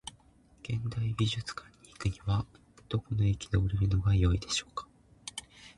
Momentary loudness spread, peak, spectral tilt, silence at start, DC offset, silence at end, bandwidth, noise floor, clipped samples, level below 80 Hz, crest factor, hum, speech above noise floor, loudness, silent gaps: 17 LU; -16 dBFS; -5.5 dB/octave; 0.05 s; under 0.1%; 0.05 s; 11.5 kHz; -61 dBFS; under 0.1%; -42 dBFS; 16 dB; none; 31 dB; -32 LUFS; none